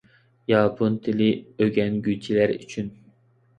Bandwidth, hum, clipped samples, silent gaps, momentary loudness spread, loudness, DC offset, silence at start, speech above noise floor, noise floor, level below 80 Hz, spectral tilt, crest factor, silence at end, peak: 8.8 kHz; none; under 0.1%; none; 12 LU; -23 LUFS; under 0.1%; 0.5 s; 37 dB; -59 dBFS; -58 dBFS; -7.5 dB/octave; 18 dB; 0.7 s; -6 dBFS